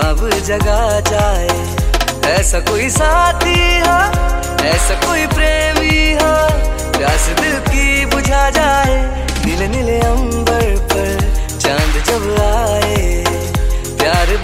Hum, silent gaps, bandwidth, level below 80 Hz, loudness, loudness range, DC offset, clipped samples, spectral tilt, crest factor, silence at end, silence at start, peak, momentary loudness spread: none; none; 16 kHz; -18 dBFS; -14 LUFS; 3 LU; under 0.1%; under 0.1%; -4 dB/octave; 12 dB; 0 s; 0 s; 0 dBFS; 5 LU